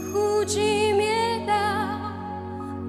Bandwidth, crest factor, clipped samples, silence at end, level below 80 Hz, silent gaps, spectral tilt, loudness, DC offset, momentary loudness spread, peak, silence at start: 15 kHz; 14 dB; under 0.1%; 0 s; -56 dBFS; none; -4 dB/octave; -24 LUFS; under 0.1%; 12 LU; -12 dBFS; 0 s